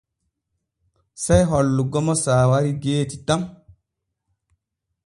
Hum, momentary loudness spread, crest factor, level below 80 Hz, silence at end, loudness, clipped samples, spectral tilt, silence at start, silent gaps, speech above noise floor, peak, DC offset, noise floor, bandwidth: none; 7 LU; 20 dB; -40 dBFS; 1.55 s; -20 LUFS; under 0.1%; -6 dB/octave; 1.2 s; none; 60 dB; -2 dBFS; under 0.1%; -79 dBFS; 11.5 kHz